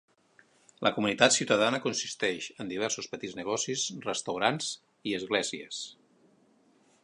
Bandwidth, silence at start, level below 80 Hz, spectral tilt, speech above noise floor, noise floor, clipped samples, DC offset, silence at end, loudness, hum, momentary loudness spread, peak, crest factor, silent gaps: 11 kHz; 0.8 s; -72 dBFS; -2.5 dB/octave; 35 dB; -65 dBFS; under 0.1%; under 0.1%; 1.1 s; -30 LUFS; none; 13 LU; -4 dBFS; 28 dB; none